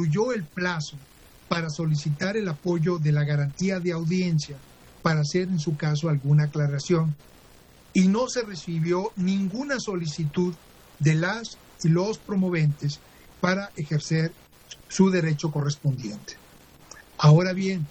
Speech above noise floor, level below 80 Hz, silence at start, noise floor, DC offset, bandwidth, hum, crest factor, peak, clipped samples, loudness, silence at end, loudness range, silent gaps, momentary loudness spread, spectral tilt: 28 dB; -58 dBFS; 0 s; -52 dBFS; under 0.1%; 8.6 kHz; none; 18 dB; -6 dBFS; under 0.1%; -25 LUFS; 0 s; 2 LU; none; 11 LU; -6.5 dB/octave